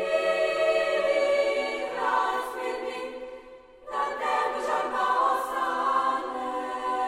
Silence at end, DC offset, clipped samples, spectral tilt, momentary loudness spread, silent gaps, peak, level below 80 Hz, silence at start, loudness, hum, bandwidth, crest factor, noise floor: 0 s; under 0.1%; under 0.1%; -2.5 dB/octave; 11 LU; none; -12 dBFS; -62 dBFS; 0 s; -27 LUFS; none; 16 kHz; 16 dB; -48 dBFS